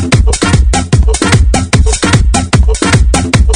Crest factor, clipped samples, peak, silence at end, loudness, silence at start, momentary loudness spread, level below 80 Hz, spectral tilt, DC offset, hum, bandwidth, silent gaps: 8 dB; 0.8%; 0 dBFS; 0 s; -9 LUFS; 0 s; 1 LU; -10 dBFS; -4.5 dB/octave; under 0.1%; none; 10.5 kHz; none